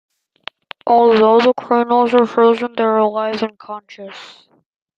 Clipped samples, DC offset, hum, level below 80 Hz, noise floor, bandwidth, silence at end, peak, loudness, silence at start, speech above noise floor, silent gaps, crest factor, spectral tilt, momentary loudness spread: under 0.1%; under 0.1%; none; -64 dBFS; -38 dBFS; 7.4 kHz; 0.7 s; -2 dBFS; -14 LUFS; 0.85 s; 24 dB; none; 14 dB; -6 dB/octave; 23 LU